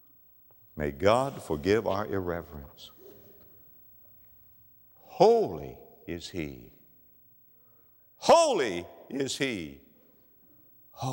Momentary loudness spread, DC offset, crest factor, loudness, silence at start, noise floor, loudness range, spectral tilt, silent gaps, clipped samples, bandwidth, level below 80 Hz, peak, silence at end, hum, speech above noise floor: 26 LU; under 0.1%; 24 dB; -28 LUFS; 0.75 s; -60 dBFS; 5 LU; -4.5 dB/octave; none; under 0.1%; 16 kHz; -56 dBFS; -6 dBFS; 0 s; none; 33 dB